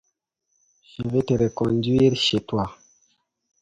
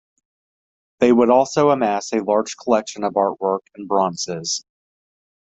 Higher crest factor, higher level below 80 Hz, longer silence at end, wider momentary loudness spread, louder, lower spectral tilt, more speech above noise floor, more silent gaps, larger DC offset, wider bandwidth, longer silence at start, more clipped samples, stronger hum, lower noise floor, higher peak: about the same, 18 dB vs 18 dB; first, -50 dBFS vs -62 dBFS; about the same, 0.85 s vs 0.8 s; first, 14 LU vs 9 LU; second, -22 LUFS vs -19 LUFS; first, -6 dB/octave vs -4.5 dB/octave; second, 54 dB vs over 72 dB; neither; neither; first, 9.4 kHz vs 8.2 kHz; about the same, 1 s vs 1 s; neither; neither; second, -75 dBFS vs under -90 dBFS; second, -6 dBFS vs -2 dBFS